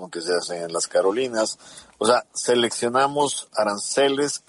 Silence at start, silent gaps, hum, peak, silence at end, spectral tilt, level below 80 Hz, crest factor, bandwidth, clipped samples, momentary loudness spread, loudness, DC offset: 0 s; none; none; -4 dBFS; 0.1 s; -2.5 dB/octave; -70 dBFS; 18 dB; 11.5 kHz; under 0.1%; 5 LU; -22 LUFS; under 0.1%